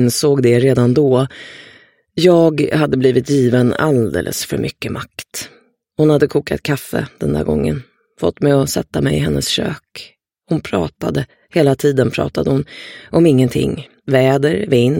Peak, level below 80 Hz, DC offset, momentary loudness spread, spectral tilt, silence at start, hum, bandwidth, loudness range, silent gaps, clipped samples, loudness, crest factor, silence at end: 0 dBFS; -42 dBFS; under 0.1%; 14 LU; -6 dB/octave; 0 s; none; 17 kHz; 4 LU; none; under 0.1%; -15 LUFS; 16 dB; 0 s